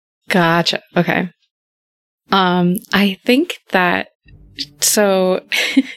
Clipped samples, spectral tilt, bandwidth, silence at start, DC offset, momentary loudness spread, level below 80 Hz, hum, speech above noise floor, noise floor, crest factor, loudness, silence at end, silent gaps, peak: under 0.1%; -4 dB/octave; 16.5 kHz; 0.3 s; under 0.1%; 7 LU; -56 dBFS; none; over 74 dB; under -90 dBFS; 16 dB; -15 LUFS; 0 s; 1.51-2.18 s, 4.15-4.20 s; 0 dBFS